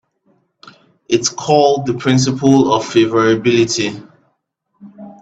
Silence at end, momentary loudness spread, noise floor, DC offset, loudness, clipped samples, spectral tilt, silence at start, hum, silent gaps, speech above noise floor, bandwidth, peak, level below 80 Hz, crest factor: 0.1 s; 7 LU; -68 dBFS; under 0.1%; -14 LUFS; under 0.1%; -5 dB/octave; 1.1 s; none; none; 54 dB; 8.4 kHz; 0 dBFS; -54 dBFS; 16 dB